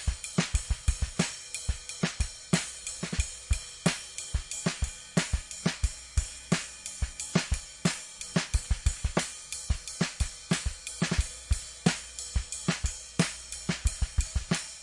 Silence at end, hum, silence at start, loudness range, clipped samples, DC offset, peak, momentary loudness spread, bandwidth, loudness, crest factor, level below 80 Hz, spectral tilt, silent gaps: 0 s; none; 0 s; 1 LU; under 0.1%; under 0.1%; -8 dBFS; 6 LU; 11.5 kHz; -32 LUFS; 24 dB; -36 dBFS; -4 dB/octave; none